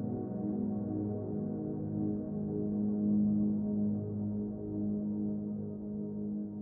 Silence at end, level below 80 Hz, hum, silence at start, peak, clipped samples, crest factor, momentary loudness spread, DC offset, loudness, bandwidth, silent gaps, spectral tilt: 0 s; -60 dBFS; none; 0 s; -22 dBFS; under 0.1%; 12 dB; 8 LU; under 0.1%; -35 LUFS; 1.6 kHz; none; -13 dB/octave